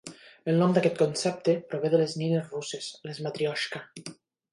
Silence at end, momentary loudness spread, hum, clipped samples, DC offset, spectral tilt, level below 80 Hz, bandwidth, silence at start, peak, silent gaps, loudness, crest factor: 0.4 s; 15 LU; none; under 0.1%; under 0.1%; -5.5 dB/octave; -74 dBFS; 11.5 kHz; 0.05 s; -8 dBFS; none; -28 LUFS; 20 dB